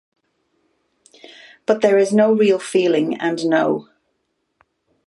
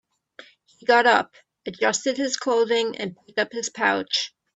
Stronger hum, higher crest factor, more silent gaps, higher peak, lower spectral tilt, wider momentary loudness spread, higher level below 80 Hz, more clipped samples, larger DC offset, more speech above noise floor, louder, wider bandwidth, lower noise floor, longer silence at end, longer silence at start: neither; about the same, 18 dB vs 20 dB; neither; about the same, -2 dBFS vs -4 dBFS; first, -5.5 dB/octave vs -2 dB/octave; second, 7 LU vs 13 LU; about the same, -72 dBFS vs -72 dBFS; neither; neither; first, 55 dB vs 27 dB; first, -17 LUFS vs -22 LUFS; first, 11.5 kHz vs 8.4 kHz; first, -71 dBFS vs -50 dBFS; first, 1.25 s vs 0.3 s; first, 1.7 s vs 0.9 s